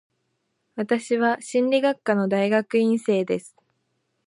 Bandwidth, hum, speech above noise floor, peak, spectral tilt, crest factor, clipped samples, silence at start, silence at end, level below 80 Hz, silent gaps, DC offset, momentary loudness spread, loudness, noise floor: 11.5 kHz; none; 52 dB; -6 dBFS; -5.5 dB/octave; 16 dB; under 0.1%; 0.75 s; 0.8 s; -76 dBFS; none; under 0.1%; 7 LU; -23 LUFS; -74 dBFS